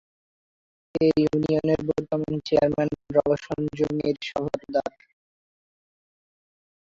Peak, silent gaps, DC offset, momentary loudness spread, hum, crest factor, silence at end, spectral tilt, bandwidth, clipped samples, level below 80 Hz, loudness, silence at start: -8 dBFS; none; under 0.1%; 7 LU; none; 20 dB; 1.95 s; -7.5 dB/octave; 7.6 kHz; under 0.1%; -54 dBFS; -25 LUFS; 0.95 s